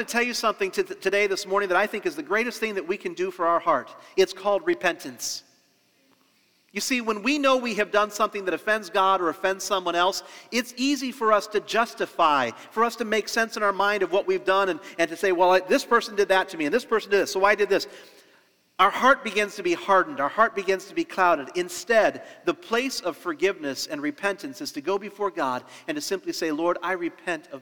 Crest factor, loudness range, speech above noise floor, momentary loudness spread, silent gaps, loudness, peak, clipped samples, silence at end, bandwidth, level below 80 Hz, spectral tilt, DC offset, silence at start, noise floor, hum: 20 dB; 5 LU; 40 dB; 9 LU; none; -24 LUFS; -4 dBFS; under 0.1%; 0 s; over 20 kHz; -66 dBFS; -3 dB/octave; 0.1%; 0 s; -64 dBFS; none